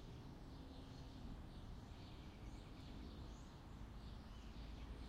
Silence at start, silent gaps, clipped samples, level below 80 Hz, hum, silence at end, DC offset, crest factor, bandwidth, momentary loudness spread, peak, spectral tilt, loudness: 0 s; none; under 0.1%; -58 dBFS; none; 0 s; under 0.1%; 12 dB; 15.5 kHz; 2 LU; -42 dBFS; -6 dB/octave; -57 LUFS